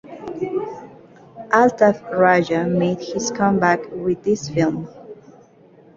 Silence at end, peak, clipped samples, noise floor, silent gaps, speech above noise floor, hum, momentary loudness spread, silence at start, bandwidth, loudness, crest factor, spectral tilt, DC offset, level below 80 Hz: 0.8 s; -2 dBFS; under 0.1%; -49 dBFS; none; 31 dB; none; 16 LU; 0.05 s; 7.8 kHz; -19 LUFS; 18 dB; -5.5 dB/octave; under 0.1%; -56 dBFS